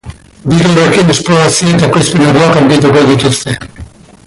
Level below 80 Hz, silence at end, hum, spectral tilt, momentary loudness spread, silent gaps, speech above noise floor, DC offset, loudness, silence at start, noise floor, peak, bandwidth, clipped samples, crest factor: -36 dBFS; 0.4 s; none; -5 dB/octave; 10 LU; none; 23 dB; under 0.1%; -8 LUFS; 0.05 s; -31 dBFS; 0 dBFS; 11.5 kHz; under 0.1%; 8 dB